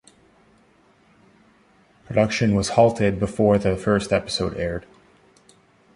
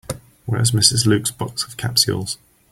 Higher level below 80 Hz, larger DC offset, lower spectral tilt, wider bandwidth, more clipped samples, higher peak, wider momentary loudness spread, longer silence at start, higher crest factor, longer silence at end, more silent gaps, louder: about the same, -44 dBFS vs -48 dBFS; neither; first, -6 dB/octave vs -3.5 dB/octave; second, 11.5 kHz vs 16 kHz; neither; about the same, -2 dBFS vs 0 dBFS; second, 8 LU vs 16 LU; first, 2.1 s vs 0.1 s; about the same, 20 dB vs 20 dB; first, 1.15 s vs 0.35 s; neither; second, -21 LUFS vs -18 LUFS